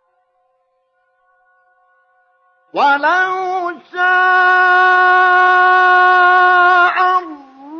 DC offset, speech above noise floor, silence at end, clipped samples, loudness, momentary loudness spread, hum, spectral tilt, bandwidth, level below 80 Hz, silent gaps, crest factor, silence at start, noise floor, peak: under 0.1%; 51 dB; 0 s; under 0.1%; -11 LUFS; 10 LU; none; -2.5 dB/octave; 6.8 kHz; -76 dBFS; none; 12 dB; 2.75 s; -63 dBFS; -2 dBFS